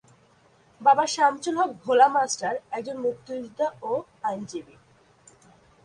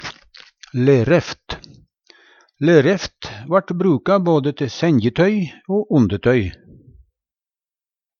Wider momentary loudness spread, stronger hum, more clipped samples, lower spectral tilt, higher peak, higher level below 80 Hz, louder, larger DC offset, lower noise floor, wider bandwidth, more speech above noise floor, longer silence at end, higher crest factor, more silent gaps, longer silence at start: about the same, 15 LU vs 15 LU; neither; neither; second, -3 dB/octave vs -7 dB/octave; second, -6 dBFS vs 0 dBFS; second, -70 dBFS vs -48 dBFS; second, -24 LUFS vs -17 LUFS; neither; second, -59 dBFS vs under -90 dBFS; first, 11 kHz vs 7.2 kHz; second, 35 dB vs over 74 dB; second, 1.25 s vs 1.7 s; about the same, 20 dB vs 18 dB; neither; first, 0.8 s vs 0 s